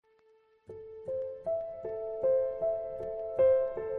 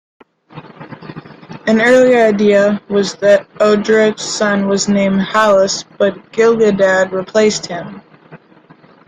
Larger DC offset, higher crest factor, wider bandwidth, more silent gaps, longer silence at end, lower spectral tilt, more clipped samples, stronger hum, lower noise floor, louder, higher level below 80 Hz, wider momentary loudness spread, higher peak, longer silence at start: neither; about the same, 16 dB vs 14 dB; second, 3.4 kHz vs 10 kHz; neither; second, 0 s vs 0.7 s; first, -8.5 dB/octave vs -4.5 dB/octave; neither; neither; first, -66 dBFS vs -45 dBFS; second, -32 LUFS vs -12 LUFS; second, -64 dBFS vs -54 dBFS; first, 17 LU vs 12 LU; second, -16 dBFS vs 0 dBFS; first, 0.7 s vs 0.55 s